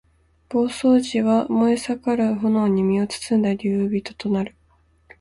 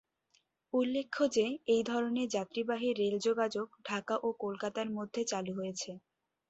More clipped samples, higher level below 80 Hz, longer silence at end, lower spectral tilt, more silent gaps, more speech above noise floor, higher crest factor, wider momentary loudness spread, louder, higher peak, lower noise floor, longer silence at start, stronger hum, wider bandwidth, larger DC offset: neither; first, -56 dBFS vs -76 dBFS; first, 0.7 s vs 0.5 s; first, -6.5 dB/octave vs -4 dB/octave; neither; about the same, 39 dB vs 41 dB; about the same, 14 dB vs 16 dB; about the same, 7 LU vs 8 LU; first, -21 LUFS vs -34 LUFS; first, -8 dBFS vs -18 dBFS; second, -59 dBFS vs -75 dBFS; second, 0.5 s vs 0.75 s; neither; first, 11.5 kHz vs 8.2 kHz; neither